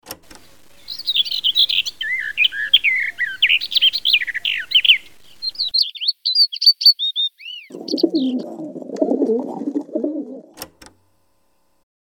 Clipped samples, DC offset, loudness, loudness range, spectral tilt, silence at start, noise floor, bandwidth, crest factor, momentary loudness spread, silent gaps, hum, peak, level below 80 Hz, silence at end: under 0.1%; under 0.1%; -16 LUFS; 9 LU; -2 dB/octave; 0.05 s; -66 dBFS; over 20 kHz; 20 dB; 20 LU; none; none; 0 dBFS; -62 dBFS; 1.35 s